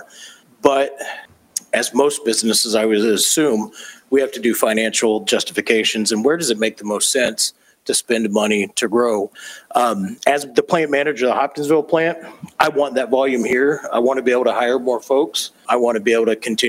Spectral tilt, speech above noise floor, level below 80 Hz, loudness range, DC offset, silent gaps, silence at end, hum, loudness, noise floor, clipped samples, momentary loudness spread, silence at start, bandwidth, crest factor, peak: -2.5 dB/octave; 25 dB; -64 dBFS; 2 LU; under 0.1%; none; 0 s; none; -17 LUFS; -42 dBFS; under 0.1%; 7 LU; 0 s; 16 kHz; 18 dB; 0 dBFS